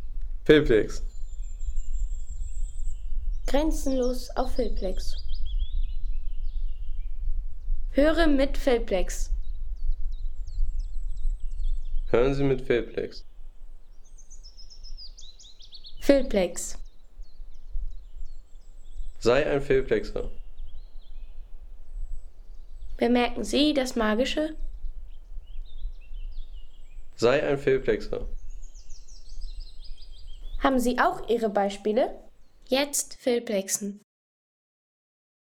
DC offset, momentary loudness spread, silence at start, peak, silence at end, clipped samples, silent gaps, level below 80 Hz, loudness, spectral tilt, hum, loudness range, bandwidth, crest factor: under 0.1%; 24 LU; 0 s; -4 dBFS; 1.55 s; under 0.1%; none; -32 dBFS; -27 LUFS; -4.5 dB/octave; none; 6 LU; 15 kHz; 22 dB